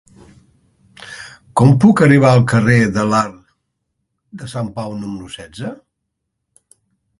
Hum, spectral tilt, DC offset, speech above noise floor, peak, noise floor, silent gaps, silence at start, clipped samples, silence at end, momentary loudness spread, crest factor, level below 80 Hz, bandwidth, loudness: none; -7 dB/octave; under 0.1%; 62 dB; 0 dBFS; -75 dBFS; none; 1 s; under 0.1%; 1.45 s; 23 LU; 16 dB; -48 dBFS; 11.5 kHz; -13 LUFS